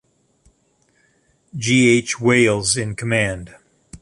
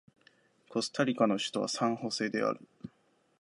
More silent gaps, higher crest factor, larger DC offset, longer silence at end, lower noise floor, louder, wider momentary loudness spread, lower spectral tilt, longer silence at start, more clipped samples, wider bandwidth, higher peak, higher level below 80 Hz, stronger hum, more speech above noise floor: neither; about the same, 18 dB vs 22 dB; neither; second, 0.05 s vs 0.55 s; second, -62 dBFS vs -70 dBFS; first, -17 LUFS vs -32 LUFS; second, 12 LU vs 18 LU; about the same, -4 dB/octave vs -4 dB/octave; first, 1.55 s vs 0.7 s; neither; about the same, 11.5 kHz vs 11.5 kHz; first, -2 dBFS vs -12 dBFS; first, -48 dBFS vs -78 dBFS; neither; first, 45 dB vs 38 dB